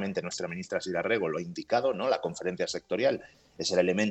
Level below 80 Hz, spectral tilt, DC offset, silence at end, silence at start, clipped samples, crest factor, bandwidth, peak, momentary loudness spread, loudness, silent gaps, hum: -70 dBFS; -4.5 dB/octave; under 0.1%; 0 s; 0 s; under 0.1%; 18 dB; 8.6 kHz; -12 dBFS; 8 LU; -30 LUFS; none; none